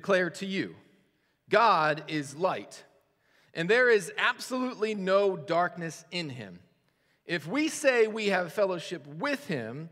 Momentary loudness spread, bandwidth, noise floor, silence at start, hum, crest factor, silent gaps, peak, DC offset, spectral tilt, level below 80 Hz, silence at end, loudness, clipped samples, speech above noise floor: 15 LU; 16 kHz; -71 dBFS; 0.05 s; none; 22 dB; none; -8 dBFS; under 0.1%; -4.5 dB/octave; -82 dBFS; 0.05 s; -28 LUFS; under 0.1%; 43 dB